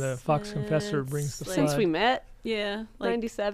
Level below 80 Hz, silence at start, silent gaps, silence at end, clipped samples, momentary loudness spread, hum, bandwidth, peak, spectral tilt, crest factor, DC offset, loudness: -52 dBFS; 0 s; none; 0 s; under 0.1%; 7 LU; none; 15.5 kHz; -12 dBFS; -5.5 dB/octave; 16 dB; under 0.1%; -28 LUFS